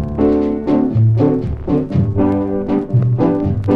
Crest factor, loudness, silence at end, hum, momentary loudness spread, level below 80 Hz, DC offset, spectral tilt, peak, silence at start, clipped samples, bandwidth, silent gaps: 12 dB; -16 LUFS; 0 s; none; 5 LU; -32 dBFS; under 0.1%; -11.5 dB/octave; -2 dBFS; 0 s; under 0.1%; 5.2 kHz; none